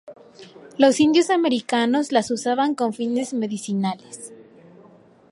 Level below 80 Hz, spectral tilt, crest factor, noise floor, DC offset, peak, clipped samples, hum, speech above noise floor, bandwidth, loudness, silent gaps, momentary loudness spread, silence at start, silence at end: -68 dBFS; -4.5 dB/octave; 20 dB; -51 dBFS; under 0.1%; -2 dBFS; under 0.1%; none; 30 dB; 11.5 kHz; -21 LUFS; none; 18 LU; 0.05 s; 0.9 s